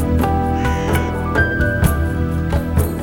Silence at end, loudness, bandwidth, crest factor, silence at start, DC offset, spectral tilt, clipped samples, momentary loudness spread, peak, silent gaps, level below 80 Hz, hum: 0 s; -18 LUFS; over 20 kHz; 16 dB; 0 s; under 0.1%; -6.5 dB/octave; under 0.1%; 3 LU; -2 dBFS; none; -24 dBFS; none